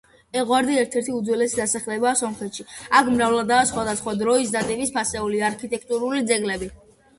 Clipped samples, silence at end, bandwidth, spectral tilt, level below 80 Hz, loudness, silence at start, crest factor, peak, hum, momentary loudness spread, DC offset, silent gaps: under 0.1%; 0.45 s; 11.5 kHz; -3 dB/octave; -52 dBFS; -22 LUFS; 0.35 s; 20 dB; -2 dBFS; none; 10 LU; under 0.1%; none